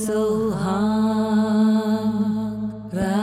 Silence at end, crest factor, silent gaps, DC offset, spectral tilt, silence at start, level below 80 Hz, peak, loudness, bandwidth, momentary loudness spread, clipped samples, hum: 0 s; 12 dB; none; under 0.1%; -7 dB/octave; 0 s; -48 dBFS; -10 dBFS; -21 LUFS; 14.5 kHz; 8 LU; under 0.1%; none